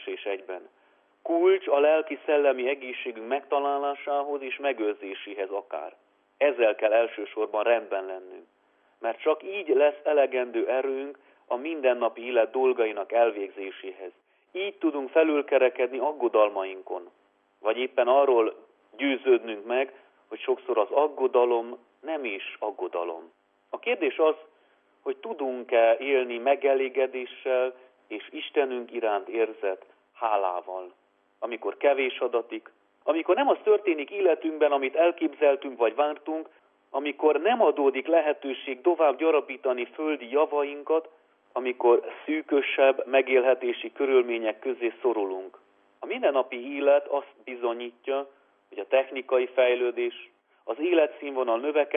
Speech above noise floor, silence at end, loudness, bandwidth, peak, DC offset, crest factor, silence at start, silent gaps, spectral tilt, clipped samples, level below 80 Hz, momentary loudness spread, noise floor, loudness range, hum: 39 dB; 0 s; -26 LUFS; 3.7 kHz; -8 dBFS; under 0.1%; 18 dB; 0 s; none; -6.5 dB/octave; under 0.1%; under -90 dBFS; 14 LU; -64 dBFS; 5 LU; none